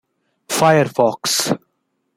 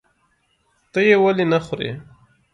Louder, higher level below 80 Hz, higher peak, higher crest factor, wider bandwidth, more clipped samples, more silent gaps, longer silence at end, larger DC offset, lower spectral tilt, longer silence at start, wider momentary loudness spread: about the same, -17 LUFS vs -18 LUFS; about the same, -60 dBFS vs -58 dBFS; about the same, -2 dBFS vs -2 dBFS; about the same, 16 dB vs 18 dB; first, 16 kHz vs 9 kHz; neither; neither; about the same, 0.6 s vs 0.5 s; neither; second, -3.5 dB/octave vs -6.5 dB/octave; second, 0.5 s vs 0.95 s; second, 9 LU vs 14 LU